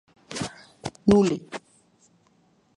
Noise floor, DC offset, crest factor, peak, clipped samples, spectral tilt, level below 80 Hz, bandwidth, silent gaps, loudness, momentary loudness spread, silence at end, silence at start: -63 dBFS; under 0.1%; 22 dB; -4 dBFS; under 0.1%; -6 dB/octave; -52 dBFS; 11.5 kHz; none; -24 LUFS; 20 LU; 1.2 s; 0.3 s